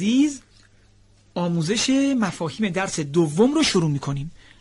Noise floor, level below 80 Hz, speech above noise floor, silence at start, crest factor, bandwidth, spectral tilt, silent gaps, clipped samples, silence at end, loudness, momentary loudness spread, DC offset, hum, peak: -55 dBFS; -50 dBFS; 34 dB; 0 s; 14 dB; 11.5 kHz; -5 dB/octave; none; under 0.1%; 0.25 s; -22 LUFS; 12 LU; under 0.1%; none; -8 dBFS